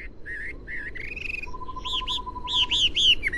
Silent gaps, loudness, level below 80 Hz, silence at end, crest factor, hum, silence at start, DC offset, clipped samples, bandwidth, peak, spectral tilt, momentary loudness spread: none; -25 LUFS; -40 dBFS; 0 s; 16 dB; none; 0 s; under 0.1%; under 0.1%; 12 kHz; -10 dBFS; -1 dB/octave; 16 LU